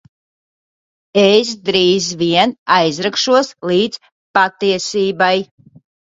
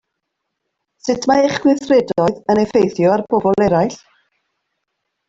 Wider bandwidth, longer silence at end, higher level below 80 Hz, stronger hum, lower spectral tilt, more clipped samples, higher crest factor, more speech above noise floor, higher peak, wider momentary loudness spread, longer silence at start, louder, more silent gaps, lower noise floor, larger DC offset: about the same, 7.8 kHz vs 7.8 kHz; second, 0.6 s vs 1.35 s; second, -58 dBFS vs -52 dBFS; neither; second, -4 dB/octave vs -6 dB/octave; neither; about the same, 16 dB vs 16 dB; first, over 76 dB vs 61 dB; about the same, 0 dBFS vs -2 dBFS; about the same, 7 LU vs 5 LU; about the same, 1.15 s vs 1.05 s; about the same, -15 LUFS vs -15 LUFS; first, 2.58-2.66 s, 4.12-4.34 s vs none; first, under -90 dBFS vs -76 dBFS; neither